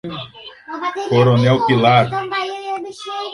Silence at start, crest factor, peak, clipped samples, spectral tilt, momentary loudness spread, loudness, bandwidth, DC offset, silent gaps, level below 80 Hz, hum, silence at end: 0.05 s; 16 dB; 0 dBFS; under 0.1%; -7 dB/octave; 18 LU; -17 LUFS; 11 kHz; under 0.1%; none; -54 dBFS; none; 0 s